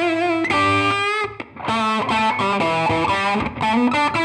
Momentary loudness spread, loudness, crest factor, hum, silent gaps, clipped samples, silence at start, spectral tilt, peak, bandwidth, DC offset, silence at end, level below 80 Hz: 5 LU; -19 LUFS; 12 dB; none; none; under 0.1%; 0 s; -5 dB/octave; -6 dBFS; 12 kHz; under 0.1%; 0 s; -48 dBFS